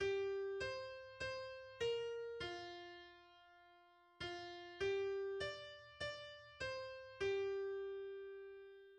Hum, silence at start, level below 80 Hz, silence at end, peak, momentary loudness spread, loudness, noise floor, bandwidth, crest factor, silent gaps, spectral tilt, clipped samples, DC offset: none; 0 s; -72 dBFS; 0 s; -30 dBFS; 15 LU; -46 LUFS; -69 dBFS; 9.4 kHz; 16 dB; none; -4 dB/octave; under 0.1%; under 0.1%